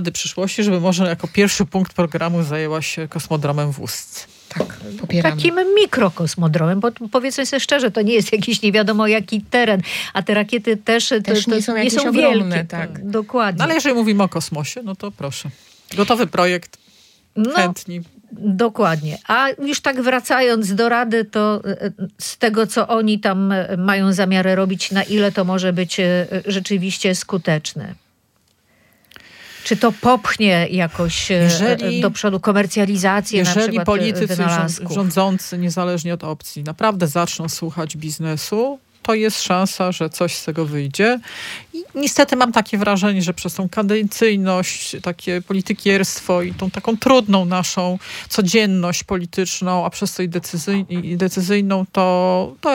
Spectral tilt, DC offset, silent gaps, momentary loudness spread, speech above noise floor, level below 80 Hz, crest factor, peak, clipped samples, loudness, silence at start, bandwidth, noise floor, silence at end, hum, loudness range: -4.5 dB/octave; under 0.1%; none; 10 LU; 43 dB; -54 dBFS; 18 dB; 0 dBFS; under 0.1%; -18 LUFS; 0 s; 17 kHz; -61 dBFS; 0 s; none; 4 LU